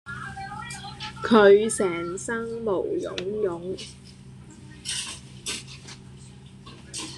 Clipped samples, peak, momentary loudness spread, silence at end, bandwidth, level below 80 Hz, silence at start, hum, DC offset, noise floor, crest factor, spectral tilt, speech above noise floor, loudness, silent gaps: under 0.1%; -4 dBFS; 27 LU; 0 s; 12.5 kHz; -54 dBFS; 0.05 s; none; under 0.1%; -45 dBFS; 24 dB; -4 dB/octave; 23 dB; -25 LUFS; none